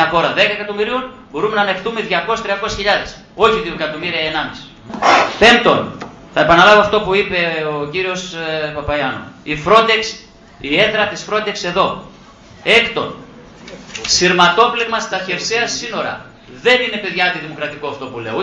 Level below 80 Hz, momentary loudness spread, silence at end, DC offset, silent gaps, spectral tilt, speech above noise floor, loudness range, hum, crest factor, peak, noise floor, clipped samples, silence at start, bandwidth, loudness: -44 dBFS; 16 LU; 0 s; under 0.1%; none; -3 dB/octave; 25 dB; 5 LU; none; 16 dB; 0 dBFS; -41 dBFS; under 0.1%; 0 s; 9.8 kHz; -15 LUFS